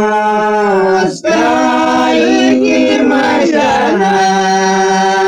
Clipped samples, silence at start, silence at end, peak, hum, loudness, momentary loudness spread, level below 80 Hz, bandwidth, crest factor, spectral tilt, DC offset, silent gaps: under 0.1%; 0 s; 0 s; 0 dBFS; none; -10 LUFS; 2 LU; -48 dBFS; 11 kHz; 10 dB; -4.5 dB/octave; under 0.1%; none